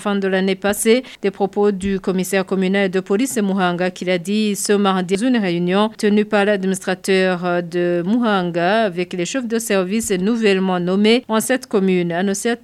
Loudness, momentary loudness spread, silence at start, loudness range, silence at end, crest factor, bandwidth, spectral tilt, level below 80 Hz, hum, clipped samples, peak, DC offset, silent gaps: -18 LUFS; 5 LU; 0 s; 1 LU; 0.05 s; 14 dB; 14.5 kHz; -5 dB/octave; -54 dBFS; none; under 0.1%; -4 dBFS; under 0.1%; none